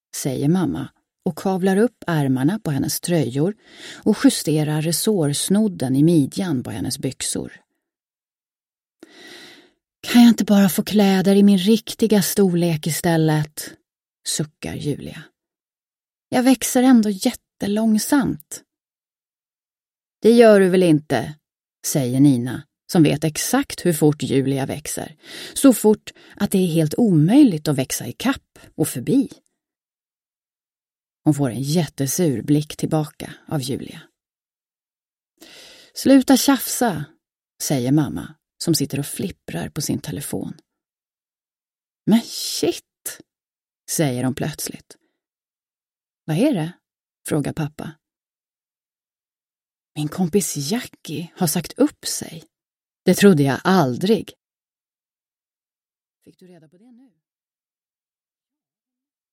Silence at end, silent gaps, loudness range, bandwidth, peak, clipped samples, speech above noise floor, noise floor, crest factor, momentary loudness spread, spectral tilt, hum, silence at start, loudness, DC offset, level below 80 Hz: 5.05 s; 35.13-35.17 s; 10 LU; 16.5 kHz; 0 dBFS; under 0.1%; over 71 dB; under -90 dBFS; 20 dB; 16 LU; -5.5 dB/octave; none; 0.15 s; -19 LUFS; under 0.1%; -56 dBFS